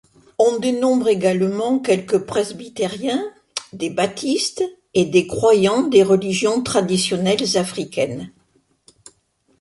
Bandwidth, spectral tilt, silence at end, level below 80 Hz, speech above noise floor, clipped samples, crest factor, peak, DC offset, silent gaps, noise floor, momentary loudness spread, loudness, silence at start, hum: 11.5 kHz; -4.5 dB/octave; 1.3 s; -56 dBFS; 44 dB; under 0.1%; 16 dB; -2 dBFS; under 0.1%; none; -62 dBFS; 11 LU; -19 LUFS; 0.4 s; none